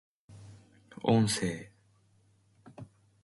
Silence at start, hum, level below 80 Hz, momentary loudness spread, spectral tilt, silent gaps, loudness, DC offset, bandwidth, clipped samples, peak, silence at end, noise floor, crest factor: 0.3 s; none; -64 dBFS; 27 LU; -5.5 dB/octave; none; -30 LUFS; under 0.1%; 11.5 kHz; under 0.1%; -12 dBFS; 0.4 s; -67 dBFS; 22 dB